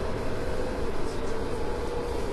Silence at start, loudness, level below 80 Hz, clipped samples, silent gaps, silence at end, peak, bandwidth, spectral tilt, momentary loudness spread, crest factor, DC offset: 0 s; -32 LUFS; -34 dBFS; under 0.1%; none; 0 s; -16 dBFS; 12.5 kHz; -6 dB/octave; 1 LU; 12 dB; under 0.1%